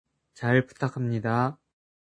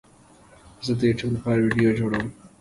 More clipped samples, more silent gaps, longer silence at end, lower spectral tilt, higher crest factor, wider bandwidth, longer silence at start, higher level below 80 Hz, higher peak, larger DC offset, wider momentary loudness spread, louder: neither; neither; first, 0.65 s vs 0.15 s; about the same, -8 dB/octave vs -7 dB/octave; about the same, 20 dB vs 16 dB; second, 9.8 kHz vs 11.5 kHz; second, 0.4 s vs 0.8 s; second, -66 dBFS vs -50 dBFS; about the same, -8 dBFS vs -8 dBFS; neither; second, 7 LU vs 10 LU; second, -27 LUFS vs -23 LUFS